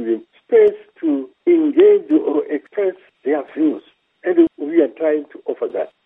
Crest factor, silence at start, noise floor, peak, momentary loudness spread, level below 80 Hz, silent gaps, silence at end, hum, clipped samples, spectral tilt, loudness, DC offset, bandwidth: 16 dB; 0 s; -40 dBFS; -2 dBFS; 12 LU; -68 dBFS; none; 0.2 s; none; under 0.1%; -8.5 dB/octave; -18 LUFS; under 0.1%; 3.8 kHz